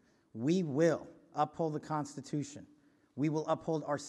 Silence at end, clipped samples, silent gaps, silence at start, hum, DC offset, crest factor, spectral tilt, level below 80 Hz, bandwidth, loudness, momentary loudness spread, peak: 0 s; under 0.1%; none; 0.35 s; none; under 0.1%; 20 dB; -6.5 dB/octave; -76 dBFS; 11.5 kHz; -35 LUFS; 14 LU; -16 dBFS